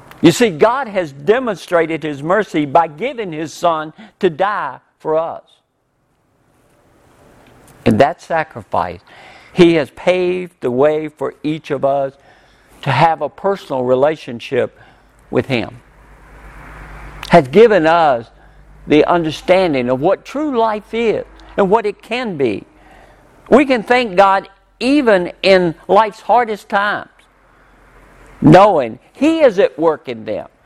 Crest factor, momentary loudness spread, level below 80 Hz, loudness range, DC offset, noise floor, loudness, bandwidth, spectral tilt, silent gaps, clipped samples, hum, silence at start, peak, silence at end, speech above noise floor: 16 dB; 13 LU; -46 dBFS; 7 LU; under 0.1%; -63 dBFS; -15 LUFS; 14 kHz; -6 dB/octave; none; under 0.1%; none; 0.2 s; 0 dBFS; 0.2 s; 49 dB